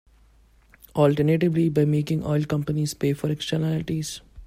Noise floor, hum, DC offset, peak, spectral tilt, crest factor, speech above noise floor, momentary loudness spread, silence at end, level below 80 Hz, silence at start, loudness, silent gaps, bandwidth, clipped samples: -56 dBFS; none; under 0.1%; -6 dBFS; -7 dB/octave; 18 dB; 34 dB; 8 LU; 0 s; -50 dBFS; 0.95 s; -24 LUFS; none; 15.5 kHz; under 0.1%